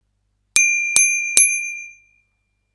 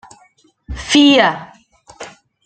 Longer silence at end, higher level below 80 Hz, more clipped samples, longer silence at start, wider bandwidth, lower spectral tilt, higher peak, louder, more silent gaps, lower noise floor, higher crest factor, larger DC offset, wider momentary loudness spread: first, 0.85 s vs 0.4 s; second, -66 dBFS vs -40 dBFS; neither; second, 0.55 s vs 0.7 s; first, 11 kHz vs 9 kHz; second, 3.5 dB/octave vs -3.5 dB/octave; about the same, 0 dBFS vs 0 dBFS; about the same, -13 LUFS vs -11 LUFS; neither; first, -69 dBFS vs -54 dBFS; about the same, 20 dB vs 18 dB; neither; second, 13 LU vs 26 LU